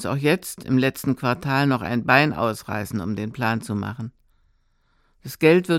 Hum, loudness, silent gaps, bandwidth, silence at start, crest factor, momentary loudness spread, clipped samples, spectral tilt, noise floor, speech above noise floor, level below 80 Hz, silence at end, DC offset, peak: none; -22 LUFS; none; 17 kHz; 0 s; 20 dB; 13 LU; under 0.1%; -6 dB/octave; -64 dBFS; 42 dB; -56 dBFS; 0 s; under 0.1%; -2 dBFS